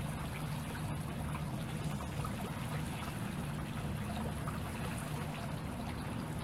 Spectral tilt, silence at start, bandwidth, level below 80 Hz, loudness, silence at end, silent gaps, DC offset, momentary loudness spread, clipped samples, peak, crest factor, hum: -5.5 dB/octave; 0 s; 16 kHz; -50 dBFS; -40 LUFS; 0 s; none; under 0.1%; 1 LU; under 0.1%; -26 dBFS; 12 dB; none